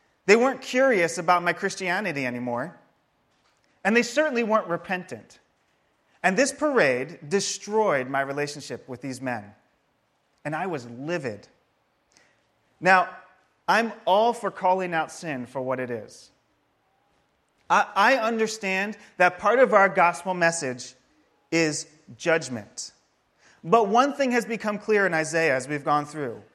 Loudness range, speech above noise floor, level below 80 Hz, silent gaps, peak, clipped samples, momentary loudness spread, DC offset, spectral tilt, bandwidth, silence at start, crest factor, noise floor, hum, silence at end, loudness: 8 LU; 46 dB; -72 dBFS; none; -2 dBFS; under 0.1%; 15 LU; under 0.1%; -4 dB/octave; 14 kHz; 0.25 s; 22 dB; -70 dBFS; none; 0.15 s; -24 LUFS